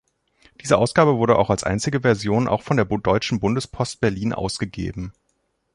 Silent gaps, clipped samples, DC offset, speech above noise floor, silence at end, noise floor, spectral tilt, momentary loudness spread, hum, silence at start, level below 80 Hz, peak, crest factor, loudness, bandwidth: none; under 0.1%; under 0.1%; 50 dB; 0.65 s; -70 dBFS; -6 dB/octave; 11 LU; none; 0.65 s; -44 dBFS; -2 dBFS; 20 dB; -21 LUFS; 11.5 kHz